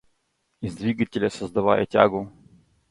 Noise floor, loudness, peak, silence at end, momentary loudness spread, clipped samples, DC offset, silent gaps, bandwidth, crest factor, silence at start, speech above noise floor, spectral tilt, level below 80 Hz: -72 dBFS; -23 LUFS; -2 dBFS; 0.6 s; 15 LU; under 0.1%; under 0.1%; none; 11.5 kHz; 24 dB; 0.6 s; 50 dB; -6.5 dB/octave; -56 dBFS